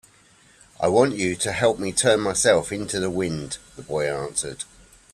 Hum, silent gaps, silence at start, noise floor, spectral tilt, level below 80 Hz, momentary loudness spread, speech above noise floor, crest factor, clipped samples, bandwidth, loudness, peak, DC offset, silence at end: none; none; 0.8 s; -55 dBFS; -3.5 dB/octave; -52 dBFS; 13 LU; 33 dB; 20 dB; under 0.1%; 14 kHz; -22 LUFS; -4 dBFS; under 0.1%; 0.5 s